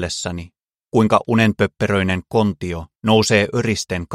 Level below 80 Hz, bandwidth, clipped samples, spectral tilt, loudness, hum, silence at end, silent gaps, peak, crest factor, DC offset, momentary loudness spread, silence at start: -44 dBFS; 13.5 kHz; under 0.1%; -5 dB/octave; -18 LUFS; none; 0 s; none; 0 dBFS; 18 dB; under 0.1%; 11 LU; 0 s